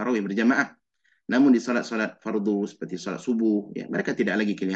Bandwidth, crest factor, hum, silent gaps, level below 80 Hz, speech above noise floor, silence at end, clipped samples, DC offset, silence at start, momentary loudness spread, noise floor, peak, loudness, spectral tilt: 8 kHz; 16 dB; none; none; -74 dBFS; 45 dB; 0 s; under 0.1%; under 0.1%; 0 s; 12 LU; -69 dBFS; -8 dBFS; -25 LUFS; -6 dB/octave